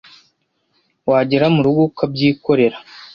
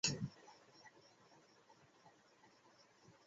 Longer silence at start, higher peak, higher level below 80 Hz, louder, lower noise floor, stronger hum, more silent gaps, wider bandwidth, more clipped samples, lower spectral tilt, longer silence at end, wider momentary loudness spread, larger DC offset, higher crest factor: first, 1.05 s vs 0.05 s; first, -2 dBFS vs -22 dBFS; first, -54 dBFS vs -78 dBFS; first, -16 LUFS vs -48 LUFS; second, -65 dBFS vs -70 dBFS; neither; neither; second, 6.6 kHz vs 7.6 kHz; neither; first, -9 dB/octave vs -3 dB/octave; about the same, 0.1 s vs 0.15 s; second, 5 LU vs 19 LU; neither; second, 16 dB vs 28 dB